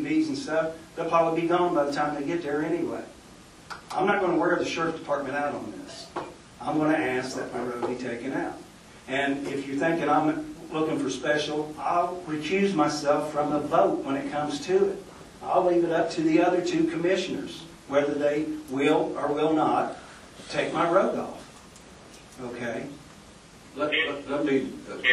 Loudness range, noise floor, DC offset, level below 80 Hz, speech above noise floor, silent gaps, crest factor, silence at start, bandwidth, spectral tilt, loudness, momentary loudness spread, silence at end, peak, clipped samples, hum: 5 LU; -49 dBFS; under 0.1%; -60 dBFS; 23 dB; none; 20 dB; 0 s; 12.5 kHz; -5 dB/octave; -26 LUFS; 15 LU; 0 s; -8 dBFS; under 0.1%; none